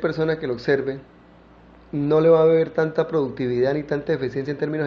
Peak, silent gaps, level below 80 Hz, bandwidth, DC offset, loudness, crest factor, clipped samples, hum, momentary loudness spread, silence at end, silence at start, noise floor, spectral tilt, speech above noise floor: -4 dBFS; none; -54 dBFS; 6.4 kHz; under 0.1%; -21 LUFS; 16 dB; under 0.1%; none; 11 LU; 0 s; 0 s; -49 dBFS; -8.5 dB/octave; 28 dB